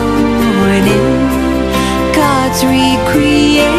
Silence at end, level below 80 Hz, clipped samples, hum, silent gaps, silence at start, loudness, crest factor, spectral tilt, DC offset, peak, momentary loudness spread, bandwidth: 0 s; -26 dBFS; under 0.1%; none; none; 0 s; -11 LUFS; 10 dB; -5 dB/octave; under 0.1%; 0 dBFS; 4 LU; 15 kHz